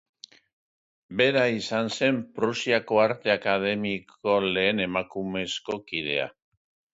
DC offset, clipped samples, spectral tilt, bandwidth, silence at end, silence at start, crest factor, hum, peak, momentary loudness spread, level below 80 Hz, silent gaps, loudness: under 0.1%; under 0.1%; -4.5 dB/octave; 8 kHz; 0.65 s; 1.1 s; 18 dB; none; -8 dBFS; 9 LU; -64 dBFS; none; -26 LUFS